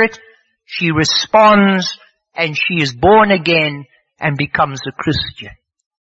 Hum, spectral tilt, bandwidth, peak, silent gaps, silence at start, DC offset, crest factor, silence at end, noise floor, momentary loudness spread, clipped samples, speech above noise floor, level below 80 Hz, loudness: none; -5 dB/octave; 8 kHz; 0 dBFS; none; 0 s; under 0.1%; 14 dB; 0.5 s; -48 dBFS; 17 LU; under 0.1%; 35 dB; -44 dBFS; -14 LUFS